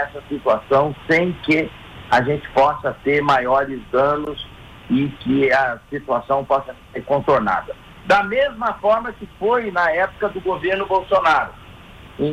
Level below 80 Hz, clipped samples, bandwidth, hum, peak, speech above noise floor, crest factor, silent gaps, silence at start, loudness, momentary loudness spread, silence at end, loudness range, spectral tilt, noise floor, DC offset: -46 dBFS; under 0.1%; 12.5 kHz; none; -6 dBFS; 22 dB; 14 dB; none; 0 s; -19 LUFS; 13 LU; 0 s; 2 LU; -6.5 dB/octave; -41 dBFS; under 0.1%